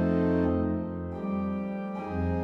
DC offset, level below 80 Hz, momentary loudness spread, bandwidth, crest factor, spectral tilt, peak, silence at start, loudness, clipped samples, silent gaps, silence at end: under 0.1%; -52 dBFS; 9 LU; 5.6 kHz; 12 dB; -10.5 dB/octave; -16 dBFS; 0 s; -30 LUFS; under 0.1%; none; 0 s